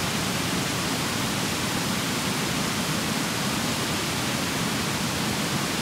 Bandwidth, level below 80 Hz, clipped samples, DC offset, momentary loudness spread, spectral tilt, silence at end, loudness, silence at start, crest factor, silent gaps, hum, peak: 16 kHz; -50 dBFS; under 0.1%; under 0.1%; 0 LU; -3 dB/octave; 0 s; -25 LUFS; 0 s; 14 dB; none; none; -12 dBFS